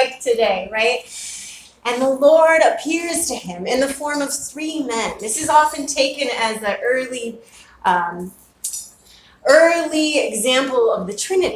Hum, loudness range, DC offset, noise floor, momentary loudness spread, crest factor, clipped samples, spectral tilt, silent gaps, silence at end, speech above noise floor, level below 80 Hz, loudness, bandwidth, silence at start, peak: none; 4 LU; under 0.1%; -49 dBFS; 15 LU; 18 dB; under 0.1%; -2 dB/octave; none; 0 s; 31 dB; -54 dBFS; -18 LUFS; 16 kHz; 0 s; 0 dBFS